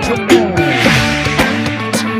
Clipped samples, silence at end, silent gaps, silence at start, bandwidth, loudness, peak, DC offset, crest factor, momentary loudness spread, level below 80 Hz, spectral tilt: under 0.1%; 0 s; none; 0 s; 16 kHz; -12 LUFS; 0 dBFS; under 0.1%; 12 dB; 6 LU; -32 dBFS; -4.5 dB/octave